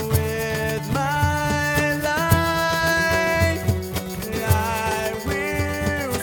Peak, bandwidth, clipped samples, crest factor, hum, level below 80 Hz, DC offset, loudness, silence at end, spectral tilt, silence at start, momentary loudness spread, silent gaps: -4 dBFS; 19 kHz; under 0.1%; 18 dB; none; -36 dBFS; under 0.1%; -22 LUFS; 0 s; -5 dB/octave; 0 s; 6 LU; none